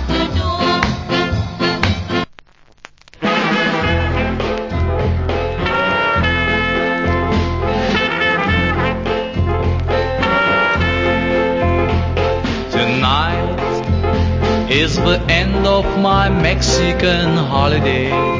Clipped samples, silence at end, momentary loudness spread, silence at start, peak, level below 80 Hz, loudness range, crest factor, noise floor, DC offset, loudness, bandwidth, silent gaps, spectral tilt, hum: under 0.1%; 0 s; 5 LU; 0 s; 0 dBFS; -24 dBFS; 4 LU; 16 dB; -45 dBFS; under 0.1%; -16 LUFS; 7.6 kHz; none; -5.5 dB/octave; none